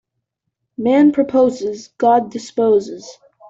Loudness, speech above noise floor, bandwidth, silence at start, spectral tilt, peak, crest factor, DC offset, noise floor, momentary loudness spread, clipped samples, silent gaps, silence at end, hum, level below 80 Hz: -16 LUFS; 60 dB; 7.8 kHz; 0.8 s; -6 dB/octave; -4 dBFS; 14 dB; under 0.1%; -76 dBFS; 16 LU; under 0.1%; none; 0.4 s; none; -60 dBFS